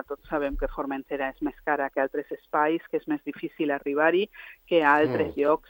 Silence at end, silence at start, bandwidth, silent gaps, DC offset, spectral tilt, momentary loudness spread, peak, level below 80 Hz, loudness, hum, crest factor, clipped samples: 0.1 s; 0.1 s; 17 kHz; none; under 0.1%; -7.5 dB/octave; 10 LU; -6 dBFS; -46 dBFS; -27 LUFS; none; 20 dB; under 0.1%